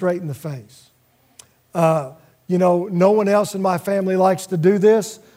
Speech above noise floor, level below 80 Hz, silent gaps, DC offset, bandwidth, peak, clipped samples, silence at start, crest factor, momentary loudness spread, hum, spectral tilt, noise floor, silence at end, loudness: 34 dB; -68 dBFS; none; under 0.1%; 16 kHz; -2 dBFS; under 0.1%; 0 s; 16 dB; 14 LU; none; -7 dB/octave; -51 dBFS; 0.2 s; -18 LUFS